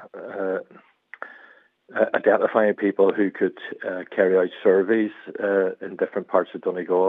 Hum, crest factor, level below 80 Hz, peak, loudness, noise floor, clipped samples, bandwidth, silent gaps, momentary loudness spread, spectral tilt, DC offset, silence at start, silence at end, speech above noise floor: none; 20 dB; -84 dBFS; -4 dBFS; -23 LUFS; -53 dBFS; under 0.1%; 4 kHz; none; 13 LU; -9 dB/octave; under 0.1%; 0 s; 0 s; 31 dB